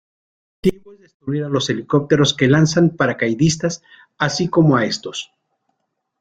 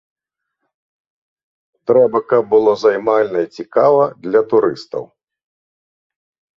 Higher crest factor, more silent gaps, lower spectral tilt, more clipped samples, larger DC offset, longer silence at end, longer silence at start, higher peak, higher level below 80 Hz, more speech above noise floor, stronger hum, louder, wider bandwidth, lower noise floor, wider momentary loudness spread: about the same, 18 dB vs 16 dB; first, 1.14-1.20 s vs none; second, -5.5 dB/octave vs -7 dB/octave; neither; neither; second, 0.95 s vs 1.5 s; second, 0.65 s vs 1.9 s; about the same, 0 dBFS vs -2 dBFS; first, -50 dBFS vs -62 dBFS; second, 56 dB vs 61 dB; neither; about the same, -17 LUFS vs -15 LUFS; first, 9.4 kHz vs 7 kHz; about the same, -74 dBFS vs -75 dBFS; about the same, 13 LU vs 12 LU